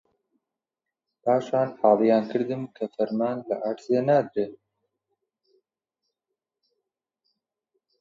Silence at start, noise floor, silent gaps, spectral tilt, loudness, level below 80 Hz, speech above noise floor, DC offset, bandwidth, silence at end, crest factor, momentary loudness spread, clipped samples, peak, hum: 1.25 s; -88 dBFS; none; -8 dB/octave; -25 LUFS; -76 dBFS; 64 dB; under 0.1%; 7.6 kHz; 3.45 s; 22 dB; 11 LU; under 0.1%; -6 dBFS; none